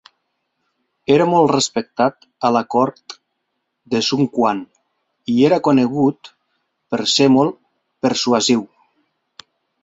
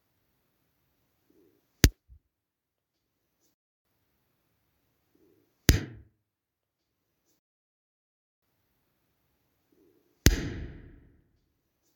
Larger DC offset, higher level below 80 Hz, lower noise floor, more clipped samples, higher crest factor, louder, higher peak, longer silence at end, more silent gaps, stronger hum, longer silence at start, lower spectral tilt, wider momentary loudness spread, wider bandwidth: neither; second, -60 dBFS vs -40 dBFS; second, -74 dBFS vs -86 dBFS; neither; second, 18 dB vs 34 dB; first, -17 LUFS vs -27 LUFS; about the same, -2 dBFS vs -2 dBFS; about the same, 1.15 s vs 1.2 s; second, none vs 3.54-3.85 s, 7.39-8.42 s; neither; second, 1.1 s vs 1.85 s; about the same, -4.5 dB/octave vs -4 dB/octave; second, 11 LU vs 18 LU; second, 8.2 kHz vs 19 kHz